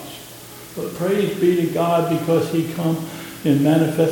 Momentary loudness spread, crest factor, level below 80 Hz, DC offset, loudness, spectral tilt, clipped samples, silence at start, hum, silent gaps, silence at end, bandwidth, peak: 17 LU; 16 dB; -58 dBFS; under 0.1%; -20 LUFS; -6.5 dB/octave; under 0.1%; 0 s; none; none; 0 s; 17.5 kHz; -4 dBFS